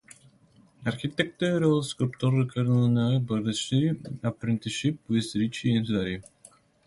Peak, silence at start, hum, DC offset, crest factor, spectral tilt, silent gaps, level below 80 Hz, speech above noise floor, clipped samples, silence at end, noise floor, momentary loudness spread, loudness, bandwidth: -10 dBFS; 0.8 s; none; under 0.1%; 18 dB; -6.5 dB/octave; none; -58 dBFS; 33 dB; under 0.1%; 0.65 s; -59 dBFS; 8 LU; -27 LUFS; 11.5 kHz